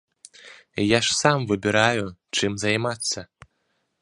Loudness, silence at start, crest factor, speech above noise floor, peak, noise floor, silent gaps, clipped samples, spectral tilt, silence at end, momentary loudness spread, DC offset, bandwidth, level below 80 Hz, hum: -22 LUFS; 0.45 s; 24 dB; 50 dB; -2 dBFS; -72 dBFS; none; under 0.1%; -3.5 dB/octave; 0.75 s; 8 LU; under 0.1%; 11.5 kHz; -56 dBFS; none